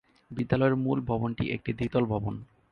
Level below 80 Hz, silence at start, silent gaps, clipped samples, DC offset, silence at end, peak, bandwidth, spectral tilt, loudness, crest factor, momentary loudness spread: -50 dBFS; 0.3 s; none; under 0.1%; under 0.1%; 0.25 s; -10 dBFS; 5.8 kHz; -9.5 dB/octave; -29 LUFS; 18 dB; 11 LU